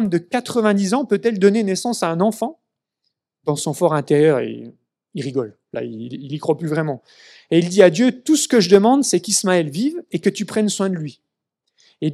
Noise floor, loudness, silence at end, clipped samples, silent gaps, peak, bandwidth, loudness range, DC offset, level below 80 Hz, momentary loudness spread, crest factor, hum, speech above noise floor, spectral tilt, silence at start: -76 dBFS; -18 LUFS; 0 s; under 0.1%; none; 0 dBFS; 14.5 kHz; 6 LU; under 0.1%; -68 dBFS; 16 LU; 18 dB; none; 58 dB; -5 dB/octave; 0 s